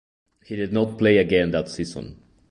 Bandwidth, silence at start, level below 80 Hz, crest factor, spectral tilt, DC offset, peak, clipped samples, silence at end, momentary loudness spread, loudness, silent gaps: 11 kHz; 0.5 s; -48 dBFS; 18 dB; -6.5 dB/octave; under 0.1%; -4 dBFS; under 0.1%; 0.35 s; 17 LU; -22 LUFS; none